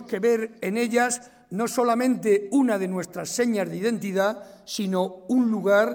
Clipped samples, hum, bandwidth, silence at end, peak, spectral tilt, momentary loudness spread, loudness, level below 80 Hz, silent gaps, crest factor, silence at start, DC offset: under 0.1%; none; 17.5 kHz; 0 s; -8 dBFS; -5 dB/octave; 9 LU; -24 LUFS; -72 dBFS; none; 16 dB; 0 s; under 0.1%